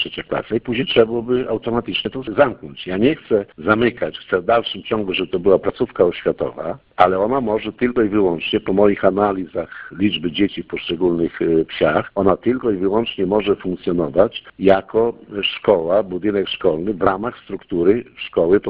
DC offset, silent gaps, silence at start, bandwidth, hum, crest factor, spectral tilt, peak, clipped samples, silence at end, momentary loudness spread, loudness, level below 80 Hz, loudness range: under 0.1%; none; 0 s; 5.2 kHz; none; 18 dB; -9 dB/octave; 0 dBFS; under 0.1%; 0 s; 7 LU; -19 LUFS; -46 dBFS; 1 LU